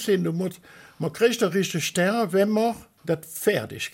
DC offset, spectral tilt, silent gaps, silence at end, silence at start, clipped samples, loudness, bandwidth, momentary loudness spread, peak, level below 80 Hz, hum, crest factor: under 0.1%; -5 dB/octave; none; 0.05 s; 0 s; under 0.1%; -24 LUFS; 17 kHz; 10 LU; -8 dBFS; -64 dBFS; none; 16 dB